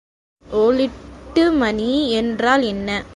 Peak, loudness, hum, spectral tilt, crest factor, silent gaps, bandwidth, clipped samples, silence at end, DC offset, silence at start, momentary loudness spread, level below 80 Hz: -2 dBFS; -18 LUFS; none; -5 dB/octave; 16 dB; none; 11.5 kHz; under 0.1%; 0 s; under 0.1%; 0.5 s; 7 LU; -44 dBFS